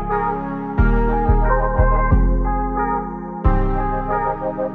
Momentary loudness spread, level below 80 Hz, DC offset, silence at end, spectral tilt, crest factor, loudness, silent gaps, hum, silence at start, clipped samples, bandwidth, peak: 6 LU; -20 dBFS; under 0.1%; 0 s; -11 dB/octave; 14 dB; -20 LUFS; none; none; 0 s; under 0.1%; 3.2 kHz; -2 dBFS